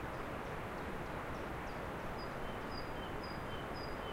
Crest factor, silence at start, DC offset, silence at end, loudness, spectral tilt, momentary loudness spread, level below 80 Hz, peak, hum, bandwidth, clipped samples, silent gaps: 14 dB; 0 s; under 0.1%; 0 s; -44 LUFS; -5.5 dB/octave; 0 LU; -52 dBFS; -30 dBFS; none; 16 kHz; under 0.1%; none